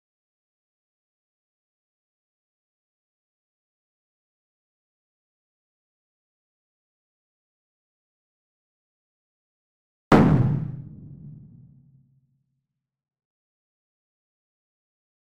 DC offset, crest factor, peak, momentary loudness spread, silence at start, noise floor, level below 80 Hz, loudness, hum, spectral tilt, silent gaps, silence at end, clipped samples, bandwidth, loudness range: under 0.1%; 28 dB; -4 dBFS; 27 LU; 10.1 s; -81 dBFS; -52 dBFS; -20 LUFS; none; -6.5 dB/octave; none; 3.9 s; under 0.1%; 3.8 kHz; 7 LU